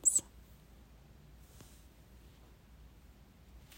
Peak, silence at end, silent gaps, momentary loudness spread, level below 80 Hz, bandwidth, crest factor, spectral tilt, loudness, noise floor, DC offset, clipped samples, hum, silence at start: -16 dBFS; 0.2 s; none; 12 LU; -60 dBFS; 16 kHz; 26 dB; -1 dB/octave; -31 LUFS; -59 dBFS; under 0.1%; under 0.1%; none; 0.05 s